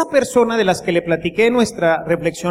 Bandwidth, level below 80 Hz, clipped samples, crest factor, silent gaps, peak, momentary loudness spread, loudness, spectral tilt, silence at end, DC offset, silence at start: 15.5 kHz; -48 dBFS; under 0.1%; 14 dB; none; -2 dBFS; 4 LU; -17 LUFS; -5 dB/octave; 0 s; under 0.1%; 0 s